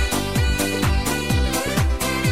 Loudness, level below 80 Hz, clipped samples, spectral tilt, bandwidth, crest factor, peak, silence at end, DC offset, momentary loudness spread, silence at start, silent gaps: -21 LUFS; -26 dBFS; under 0.1%; -4.5 dB/octave; 16 kHz; 14 dB; -6 dBFS; 0 s; 1%; 1 LU; 0 s; none